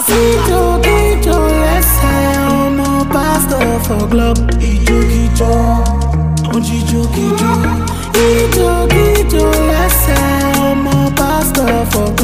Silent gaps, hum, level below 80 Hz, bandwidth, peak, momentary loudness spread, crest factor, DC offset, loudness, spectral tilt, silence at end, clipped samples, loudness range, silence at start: none; none; -16 dBFS; 16 kHz; 0 dBFS; 4 LU; 10 dB; 1%; -12 LUFS; -5 dB/octave; 0 s; under 0.1%; 2 LU; 0 s